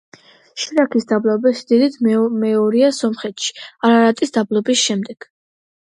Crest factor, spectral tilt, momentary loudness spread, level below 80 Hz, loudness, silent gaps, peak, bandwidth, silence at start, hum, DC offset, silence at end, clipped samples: 16 dB; -4 dB/octave; 10 LU; -68 dBFS; -17 LUFS; none; -2 dBFS; 11 kHz; 0.55 s; none; under 0.1%; 0.8 s; under 0.1%